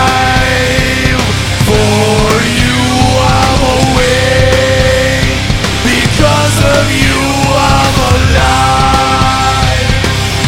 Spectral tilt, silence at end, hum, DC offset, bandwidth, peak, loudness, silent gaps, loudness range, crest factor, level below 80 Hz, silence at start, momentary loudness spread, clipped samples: -4.5 dB/octave; 0 s; none; 0.6%; 16.5 kHz; 0 dBFS; -9 LUFS; none; 1 LU; 8 dB; -18 dBFS; 0 s; 3 LU; 0.8%